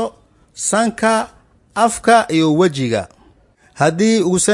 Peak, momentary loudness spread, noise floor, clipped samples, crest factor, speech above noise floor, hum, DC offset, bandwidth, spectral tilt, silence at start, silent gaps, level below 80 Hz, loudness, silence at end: 0 dBFS; 12 LU; -51 dBFS; under 0.1%; 16 dB; 37 dB; none; under 0.1%; 11.5 kHz; -4.5 dB/octave; 0 s; none; -52 dBFS; -16 LUFS; 0 s